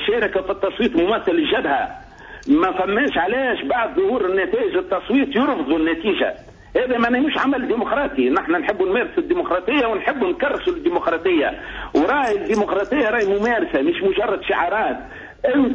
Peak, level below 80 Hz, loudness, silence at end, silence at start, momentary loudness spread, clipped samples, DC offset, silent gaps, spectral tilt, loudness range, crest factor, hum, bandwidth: -6 dBFS; -46 dBFS; -19 LUFS; 0 s; 0 s; 5 LU; under 0.1%; under 0.1%; none; -5.5 dB/octave; 1 LU; 12 dB; none; 8 kHz